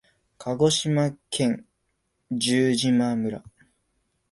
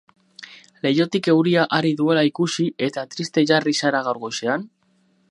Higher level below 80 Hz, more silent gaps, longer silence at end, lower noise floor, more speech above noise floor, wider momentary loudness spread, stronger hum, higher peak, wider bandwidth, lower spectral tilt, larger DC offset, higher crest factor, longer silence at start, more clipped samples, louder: first, -62 dBFS vs -70 dBFS; neither; first, 0.9 s vs 0.65 s; first, -74 dBFS vs -62 dBFS; first, 51 dB vs 43 dB; first, 12 LU vs 9 LU; neither; second, -8 dBFS vs -2 dBFS; about the same, 11.5 kHz vs 11 kHz; about the same, -5 dB/octave vs -5 dB/octave; neither; about the same, 18 dB vs 20 dB; about the same, 0.4 s vs 0.4 s; neither; second, -24 LUFS vs -20 LUFS